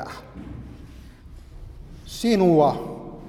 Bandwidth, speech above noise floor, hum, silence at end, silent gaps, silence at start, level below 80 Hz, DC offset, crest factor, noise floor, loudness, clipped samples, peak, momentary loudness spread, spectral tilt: 15 kHz; 23 dB; none; 0 s; none; 0 s; -44 dBFS; under 0.1%; 20 dB; -43 dBFS; -20 LUFS; under 0.1%; -6 dBFS; 27 LU; -6.5 dB/octave